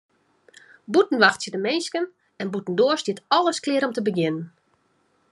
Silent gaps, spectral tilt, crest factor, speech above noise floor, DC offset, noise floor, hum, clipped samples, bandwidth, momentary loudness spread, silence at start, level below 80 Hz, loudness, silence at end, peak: none; -4 dB/octave; 22 dB; 44 dB; under 0.1%; -66 dBFS; none; under 0.1%; 11.5 kHz; 12 LU; 0.9 s; -76 dBFS; -23 LUFS; 0.85 s; -2 dBFS